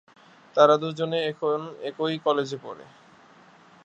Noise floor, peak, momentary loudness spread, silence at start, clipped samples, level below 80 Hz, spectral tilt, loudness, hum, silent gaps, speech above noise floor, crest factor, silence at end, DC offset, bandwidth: -53 dBFS; -4 dBFS; 17 LU; 0.55 s; under 0.1%; -78 dBFS; -5.5 dB/octave; -24 LUFS; none; none; 29 dB; 22 dB; 1 s; under 0.1%; 8 kHz